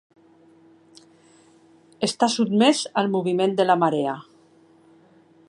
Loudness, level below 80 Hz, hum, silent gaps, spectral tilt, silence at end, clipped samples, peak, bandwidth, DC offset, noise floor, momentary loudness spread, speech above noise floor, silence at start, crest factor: -21 LUFS; -76 dBFS; none; none; -4.5 dB/octave; 1.25 s; under 0.1%; -4 dBFS; 11.5 kHz; under 0.1%; -55 dBFS; 9 LU; 34 dB; 2 s; 20 dB